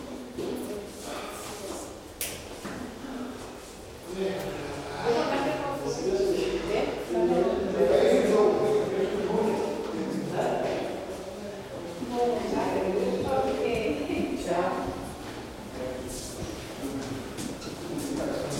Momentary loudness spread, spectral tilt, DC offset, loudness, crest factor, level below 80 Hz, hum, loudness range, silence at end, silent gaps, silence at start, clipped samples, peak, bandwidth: 13 LU; -5 dB/octave; under 0.1%; -29 LUFS; 20 dB; -50 dBFS; none; 11 LU; 0 s; none; 0 s; under 0.1%; -10 dBFS; 16.5 kHz